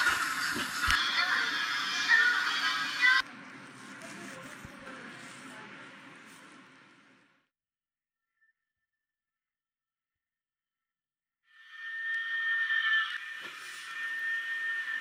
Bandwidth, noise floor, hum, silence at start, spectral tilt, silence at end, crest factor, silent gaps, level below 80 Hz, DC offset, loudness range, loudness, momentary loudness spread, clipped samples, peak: 16.5 kHz; under -90 dBFS; none; 0 s; -0.5 dB/octave; 0 s; 24 dB; none; -60 dBFS; under 0.1%; 22 LU; -29 LUFS; 22 LU; under 0.1%; -10 dBFS